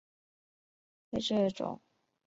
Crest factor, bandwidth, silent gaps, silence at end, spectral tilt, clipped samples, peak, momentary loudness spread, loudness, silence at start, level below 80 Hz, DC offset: 18 dB; 8 kHz; none; 0.5 s; -5.5 dB/octave; under 0.1%; -18 dBFS; 10 LU; -34 LUFS; 1.1 s; -66 dBFS; under 0.1%